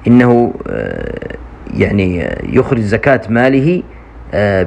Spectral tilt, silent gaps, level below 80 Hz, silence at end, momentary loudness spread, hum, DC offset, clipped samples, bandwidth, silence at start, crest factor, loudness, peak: -8.5 dB/octave; none; -32 dBFS; 0 s; 14 LU; none; under 0.1%; 0.2%; 8.8 kHz; 0 s; 12 dB; -13 LUFS; 0 dBFS